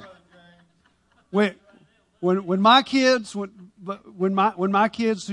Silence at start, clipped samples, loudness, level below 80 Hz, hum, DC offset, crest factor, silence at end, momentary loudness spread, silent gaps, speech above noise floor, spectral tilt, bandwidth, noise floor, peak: 0 s; under 0.1%; -21 LUFS; -68 dBFS; none; under 0.1%; 18 dB; 0 s; 19 LU; none; 42 dB; -5 dB/octave; 11 kHz; -63 dBFS; -4 dBFS